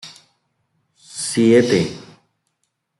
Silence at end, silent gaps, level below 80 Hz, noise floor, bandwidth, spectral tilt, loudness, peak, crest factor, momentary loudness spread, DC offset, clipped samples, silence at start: 1 s; none; -62 dBFS; -73 dBFS; 12 kHz; -5 dB/octave; -17 LUFS; -2 dBFS; 18 dB; 24 LU; under 0.1%; under 0.1%; 0.05 s